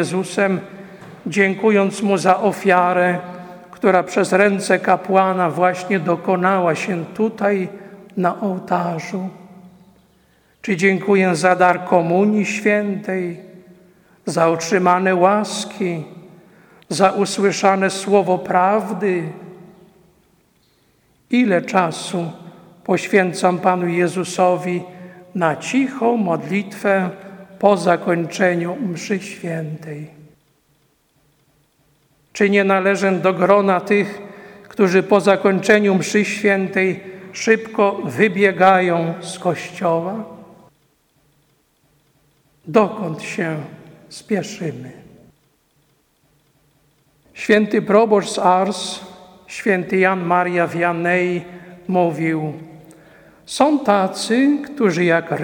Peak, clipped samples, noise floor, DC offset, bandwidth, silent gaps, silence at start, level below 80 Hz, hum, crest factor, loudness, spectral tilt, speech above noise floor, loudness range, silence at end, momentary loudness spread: 0 dBFS; under 0.1%; -61 dBFS; under 0.1%; 18 kHz; none; 0 s; -64 dBFS; none; 18 dB; -17 LUFS; -5.5 dB/octave; 44 dB; 8 LU; 0 s; 15 LU